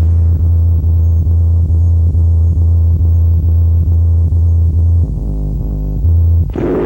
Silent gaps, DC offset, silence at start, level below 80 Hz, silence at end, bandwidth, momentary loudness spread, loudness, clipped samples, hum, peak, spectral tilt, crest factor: none; under 0.1%; 0 s; -18 dBFS; 0 s; 1.8 kHz; 5 LU; -12 LUFS; under 0.1%; none; -4 dBFS; -11.5 dB/octave; 6 dB